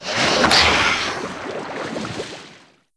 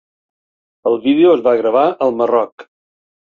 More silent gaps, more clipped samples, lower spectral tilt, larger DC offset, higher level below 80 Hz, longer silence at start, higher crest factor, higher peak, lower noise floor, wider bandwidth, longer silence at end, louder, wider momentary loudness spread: second, none vs 2.52-2.58 s; neither; second, -2.5 dB/octave vs -7.5 dB/octave; neither; first, -42 dBFS vs -64 dBFS; second, 0 s vs 0.85 s; first, 20 dB vs 14 dB; about the same, 0 dBFS vs -2 dBFS; second, -47 dBFS vs under -90 dBFS; first, 11 kHz vs 4.7 kHz; second, 0.4 s vs 0.6 s; second, -18 LUFS vs -14 LUFS; first, 17 LU vs 8 LU